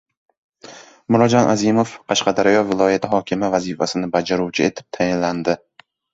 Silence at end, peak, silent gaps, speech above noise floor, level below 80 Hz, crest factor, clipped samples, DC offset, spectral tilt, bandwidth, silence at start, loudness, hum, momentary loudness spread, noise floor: 0.55 s; 0 dBFS; none; 24 dB; -54 dBFS; 18 dB; under 0.1%; under 0.1%; -5 dB/octave; 8 kHz; 0.65 s; -18 LUFS; none; 7 LU; -42 dBFS